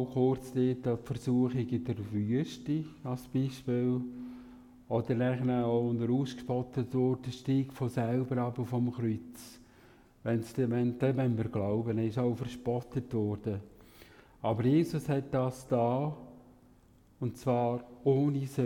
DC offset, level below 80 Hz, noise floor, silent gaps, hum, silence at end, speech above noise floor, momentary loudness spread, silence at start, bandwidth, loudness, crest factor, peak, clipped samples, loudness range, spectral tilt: under 0.1%; -62 dBFS; -61 dBFS; none; none; 0 s; 30 dB; 9 LU; 0 s; 16 kHz; -32 LUFS; 16 dB; -16 dBFS; under 0.1%; 2 LU; -8.5 dB/octave